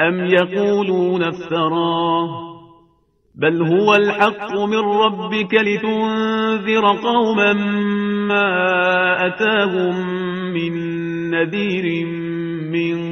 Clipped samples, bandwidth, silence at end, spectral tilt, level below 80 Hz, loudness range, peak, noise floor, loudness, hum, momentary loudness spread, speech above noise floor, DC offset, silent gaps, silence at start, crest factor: under 0.1%; 6.6 kHz; 0 s; -6.5 dB/octave; -60 dBFS; 3 LU; 0 dBFS; -59 dBFS; -18 LUFS; none; 8 LU; 41 dB; under 0.1%; none; 0 s; 18 dB